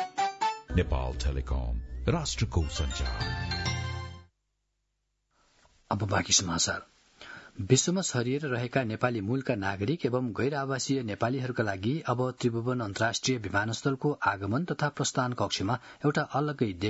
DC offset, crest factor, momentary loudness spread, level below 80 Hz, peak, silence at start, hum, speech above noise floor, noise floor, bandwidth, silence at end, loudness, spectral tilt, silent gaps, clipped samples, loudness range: under 0.1%; 22 dB; 7 LU; -42 dBFS; -8 dBFS; 0 s; none; 50 dB; -79 dBFS; 8 kHz; 0 s; -30 LUFS; -4.5 dB/octave; none; under 0.1%; 4 LU